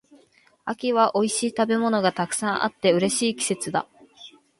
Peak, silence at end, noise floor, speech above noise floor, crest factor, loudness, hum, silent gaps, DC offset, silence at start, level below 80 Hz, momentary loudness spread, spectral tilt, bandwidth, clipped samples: -6 dBFS; 0.3 s; -59 dBFS; 36 dB; 18 dB; -23 LUFS; none; none; under 0.1%; 0.65 s; -68 dBFS; 8 LU; -3.5 dB/octave; 11.5 kHz; under 0.1%